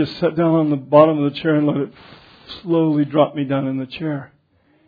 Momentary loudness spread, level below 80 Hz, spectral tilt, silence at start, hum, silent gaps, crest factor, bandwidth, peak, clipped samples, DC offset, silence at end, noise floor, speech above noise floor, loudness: 14 LU; -60 dBFS; -10 dB/octave; 0 s; none; none; 18 dB; 5 kHz; 0 dBFS; under 0.1%; under 0.1%; 0.6 s; -59 dBFS; 41 dB; -18 LUFS